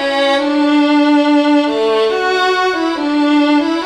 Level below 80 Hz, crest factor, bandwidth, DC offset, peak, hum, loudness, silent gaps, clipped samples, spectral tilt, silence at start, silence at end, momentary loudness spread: -52 dBFS; 10 dB; 9.6 kHz; under 0.1%; -2 dBFS; none; -13 LUFS; none; under 0.1%; -3 dB/octave; 0 s; 0 s; 4 LU